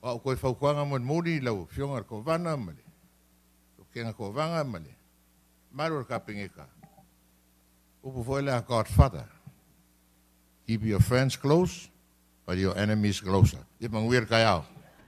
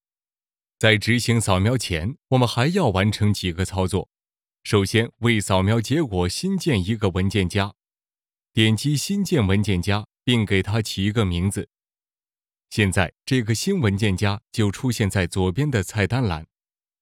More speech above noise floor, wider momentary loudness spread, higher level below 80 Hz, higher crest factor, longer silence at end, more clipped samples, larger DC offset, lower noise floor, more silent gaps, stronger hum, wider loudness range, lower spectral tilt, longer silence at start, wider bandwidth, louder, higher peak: second, 36 dB vs over 69 dB; first, 19 LU vs 6 LU; first, -42 dBFS vs -50 dBFS; first, 24 dB vs 18 dB; second, 0.4 s vs 0.55 s; neither; neither; second, -64 dBFS vs under -90 dBFS; neither; neither; first, 10 LU vs 3 LU; about the same, -6.5 dB/octave vs -5.5 dB/octave; second, 0.05 s vs 0.8 s; about the same, 15 kHz vs 16 kHz; second, -28 LUFS vs -22 LUFS; about the same, -6 dBFS vs -4 dBFS